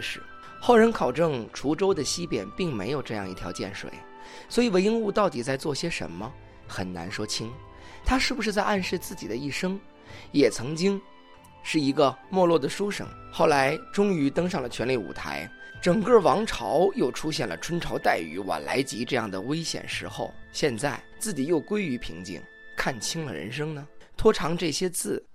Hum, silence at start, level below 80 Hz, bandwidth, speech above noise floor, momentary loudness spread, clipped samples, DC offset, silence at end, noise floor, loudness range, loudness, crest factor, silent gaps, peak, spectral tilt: none; 0 s; -48 dBFS; 15.5 kHz; 24 dB; 15 LU; under 0.1%; under 0.1%; 0 s; -50 dBFS; 5 LU; -26 LUFS; 22 dB; none; -6 dBFS; -4.5 dB/octave